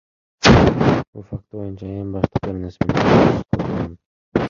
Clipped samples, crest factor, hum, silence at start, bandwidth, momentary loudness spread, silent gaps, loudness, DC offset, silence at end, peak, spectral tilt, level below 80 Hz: under 0.1%; 18 dB; none; 0.4 s; 7.4 kHz; 18 LU; 1.07-1.13 s, 4.06-4.32 s; -17 LUFS; under 0.1%; 0 s; 0 dBFS; -6.5 dB/octave; -32 dBFS